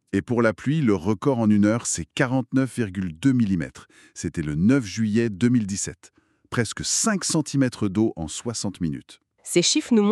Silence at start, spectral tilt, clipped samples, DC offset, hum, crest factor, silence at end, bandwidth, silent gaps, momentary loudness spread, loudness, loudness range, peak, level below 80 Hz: 0.15 s; -5 dB/octave; under 0.1%; under 0.1%; none; 18 dB; 0 s; 13 kHz; none; 10 LU; -23 LUFS; 2 LU; -6 dBFS; -52 dBFS